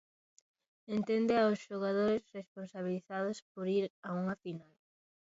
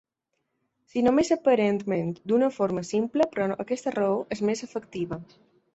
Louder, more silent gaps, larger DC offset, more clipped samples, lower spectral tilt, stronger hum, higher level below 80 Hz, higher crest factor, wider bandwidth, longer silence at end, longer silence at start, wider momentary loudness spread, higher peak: second, -35 LUFS vs -26 LUFS; first, 2.48-2.55 s, 3.42-3.55 s, 3.90-4.03 s vs none; neither; neither; about the same, -5.5 dB/octave vs -6 dB/octave; neither; second, -76 dBFS vs -62 dBFS; about the same, 18 dB vs 18 dB; about the same, 7.6 kHz vs 8.2 kHz; about the same, 0.6 s vs 0.5 s; about the same, 0.9 s vs 0.95 s; first, 16 LU vs 11 LU; second, -18 dBFS vs -10 dBFS